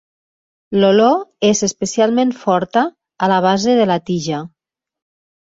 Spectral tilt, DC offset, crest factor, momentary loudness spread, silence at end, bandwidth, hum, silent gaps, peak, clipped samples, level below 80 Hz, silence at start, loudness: -4.5 dB/octave; under 0.1%; 16 dB; 8 LU; 1 s; 7.8 kHz; none; none; -2 dBFS; under 0.1%; -58 dBFS; 0.7 s; -16 LUFS